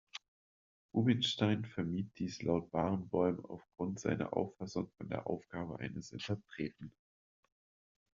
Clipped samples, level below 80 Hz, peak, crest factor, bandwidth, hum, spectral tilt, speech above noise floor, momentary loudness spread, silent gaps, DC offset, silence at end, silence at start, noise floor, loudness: under 0.1%; -68 dBFS; -18 dBFS; 22 dB; 7.4 kHz; none; -5.5 dB/octave; over 53 dB; 12 LU; 0.28-0.89 s; under 0.1%; 1.25 s; 0.15 s; under -90 dBFS; -38 LUFS